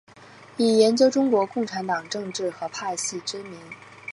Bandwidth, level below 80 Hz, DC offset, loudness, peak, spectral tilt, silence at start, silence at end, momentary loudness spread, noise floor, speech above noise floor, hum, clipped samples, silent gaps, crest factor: 11.5 kHz; -74 dBFS; under 0.1%; -23 LUFS; -6 dBFS; -3.5 dB/octave; 0.2 s; 0 s; 21 LU; -48 dBFS; 25 dB; none; under 0.1%; none; 18 dB